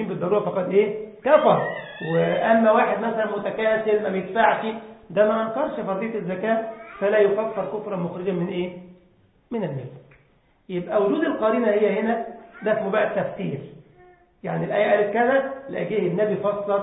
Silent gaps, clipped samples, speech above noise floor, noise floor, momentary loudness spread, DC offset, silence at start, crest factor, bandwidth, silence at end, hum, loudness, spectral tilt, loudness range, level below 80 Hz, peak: none; under 0.1%; 38 dB; -60 dBFS; 11 LU; under 0.1%; 0 s; 20 dB; 4 kHz; 0 s; none; -23 LUFS; -11 dB/octave; 6 LU; -64 dBFS; -2 dBFS